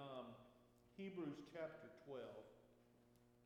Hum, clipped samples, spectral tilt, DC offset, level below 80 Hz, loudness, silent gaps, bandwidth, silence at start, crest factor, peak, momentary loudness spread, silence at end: none; under 0.1%; -7 dB/octave; under 0.1%; -84 dBFS; -55 LUFS; none; 13 kHz; 0 s; 16 dB; -40 dBFS; 14 LU; 0 s